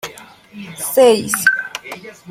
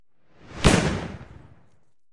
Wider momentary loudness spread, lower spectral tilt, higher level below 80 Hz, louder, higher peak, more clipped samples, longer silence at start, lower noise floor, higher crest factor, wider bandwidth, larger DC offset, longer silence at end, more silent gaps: about the same, 21 LU vs 23 LU; second, -2.5 dB/octave vs -5 dB/octave; second, -60 dBFS vs -36 dBFS; first, -14 LUFS vs -22 LUFS; about the same, -2 dBFS vs -2 dBFS; neither; second, 0.05 s vs 0.5 s; second, -35 dBFS vs -65 dBFS; second, 16 dB vs 24 dB; first, 16.5 kHz vs 11.5 kHz; neither; second, 0 s vs 0.9 s; neither